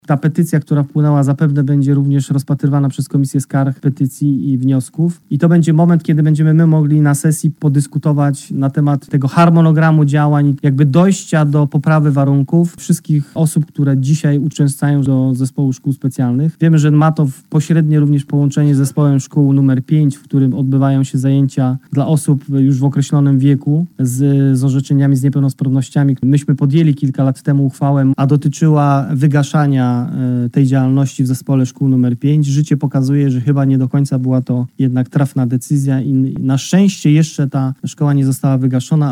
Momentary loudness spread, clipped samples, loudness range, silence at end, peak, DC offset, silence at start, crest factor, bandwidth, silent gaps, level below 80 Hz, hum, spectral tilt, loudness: 5 LU; under 0.1%; 3 LU; 0 s; -2 dBFS; under 0.1%; 0.1 s; 10 dB; 13.5 kHz; none; -58 dBFS; none; -8 dB/octave; -13 LUFS